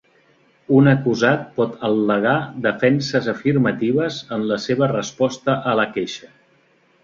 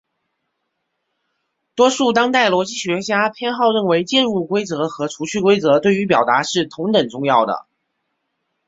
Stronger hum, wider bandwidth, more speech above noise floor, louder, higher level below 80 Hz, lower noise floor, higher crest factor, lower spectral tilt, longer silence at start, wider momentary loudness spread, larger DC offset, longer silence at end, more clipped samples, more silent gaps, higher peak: neither; about the same, 7.6 kHz vs 8 kHz; second, 39 dB vs 57 dB; about the same, -19 LUFS vs -17 LUFS; about the same, -58 dBFS vs -60 dBFS; second, -58 dBFS vs -74 dBFS; about the same, 18 dB vs 18 dB; first, -6.5 dB/octave vs -4 dB/octave; second, 0.7 s vs 1.75 s; about the same, 7 LU vs 8 LU; neither; second, 0.85 s vs 1.05 s; neither; neither; about the same, -2 dBFS vs -2 dBFS